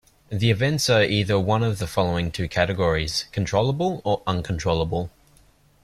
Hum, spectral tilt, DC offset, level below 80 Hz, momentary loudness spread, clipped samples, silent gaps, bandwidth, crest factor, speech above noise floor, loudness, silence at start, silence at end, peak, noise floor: none; -5 dB/octave; under 0.1%; -44 dBFS; 7 LU; under 0.1%; none; 14 kHz; 18 dB; 34 dB; -23 LUFS; 0.3 s; 0.75 s; -4 dBFS; -56 dBFS